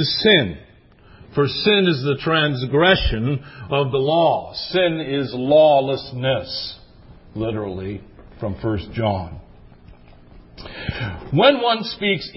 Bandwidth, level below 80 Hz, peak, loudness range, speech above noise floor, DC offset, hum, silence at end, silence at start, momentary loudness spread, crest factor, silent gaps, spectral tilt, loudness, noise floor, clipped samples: 5.8 kHz; -38 dBFS; 0 dBFS; 9 LU; 30 dB; under 0.1%; none; 0.05 s; 0 s; 15 LU; 20 dB; none; -9.5 dB/octave; -19 LUFS; -49 dBFS; under 0.1%